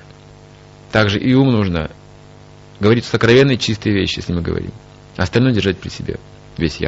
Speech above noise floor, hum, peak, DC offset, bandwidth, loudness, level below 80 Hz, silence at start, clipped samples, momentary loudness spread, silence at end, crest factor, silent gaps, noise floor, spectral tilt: 26 dB; 50 Hz at -40 dBFS; 0 dBFS; under 0.1%; 8 kHz; -16 LUFS; -38 dBFS; 0.95 s; under 0.1%; 16 LU; 0 s; 18 dB; none; -41 dBFS; -5 dB/octave